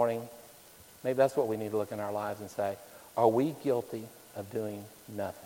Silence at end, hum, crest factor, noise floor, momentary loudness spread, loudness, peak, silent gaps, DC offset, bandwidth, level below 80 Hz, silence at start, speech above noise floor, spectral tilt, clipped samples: 0 s; none; 22 dB; -55 dBFS; 18 LU; -32 LUFS; -12 dBFS; none; under 0.1%; 17 kHz; -72 dBFS; 0 s; 23 dB; -6.5 dB/octave; under 0.1%